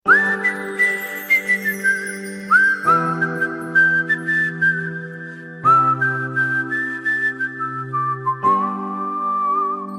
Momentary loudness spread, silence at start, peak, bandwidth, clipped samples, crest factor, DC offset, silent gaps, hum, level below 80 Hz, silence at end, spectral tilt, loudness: 10 LU; 0.05 s; -2 dBFS; 16 kHz; under 0.1%; 18 dB; under 0.1%; none; none; -66 dBFS; 0 s; -5 dB/octave; -18 LUFS